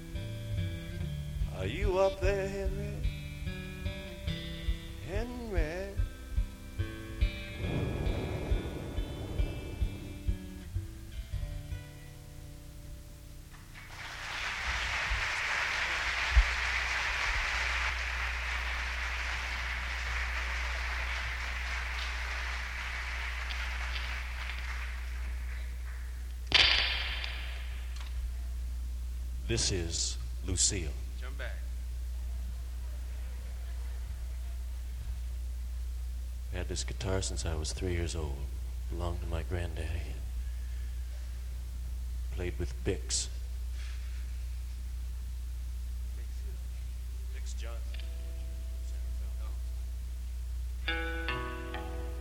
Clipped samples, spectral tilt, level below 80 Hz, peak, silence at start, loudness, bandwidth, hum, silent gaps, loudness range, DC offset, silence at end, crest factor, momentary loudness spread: under 0.1%; -3.5 dB/octave; -38 dBFS; -8 dBFS; 0 s; -35 LUFS; 16 kHz; none; none; 10 LU; under 0.1%; 0 s; 28 dB; 11 LU